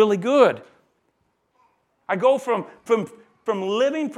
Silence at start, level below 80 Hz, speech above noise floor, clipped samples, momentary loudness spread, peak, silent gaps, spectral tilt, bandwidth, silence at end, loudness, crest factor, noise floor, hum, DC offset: 0 s; -76 dBFS; 49 dB; under 0.1%; 16 LU; -2 dBFS; none; -5.5 dB/octave; 12 kHz; 0 s; -21 LUFS; 20 dB; -69 dBFS; none; under 0.1%